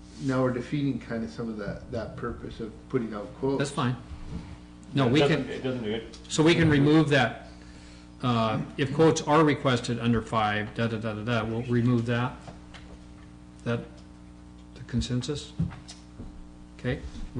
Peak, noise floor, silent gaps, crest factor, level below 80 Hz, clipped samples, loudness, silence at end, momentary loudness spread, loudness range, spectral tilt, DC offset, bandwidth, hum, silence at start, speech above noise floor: -14 dBFS; -47 dBFS; none; 14 dB; -48 dBFS; under 0.1%; -27 LUFS; 0 s; 24 LU; 10 LU; -6 dB/octave; under 0.1%; 10.5 kHz; 60 Hz at -50 dBFS; 0 s; 21 dB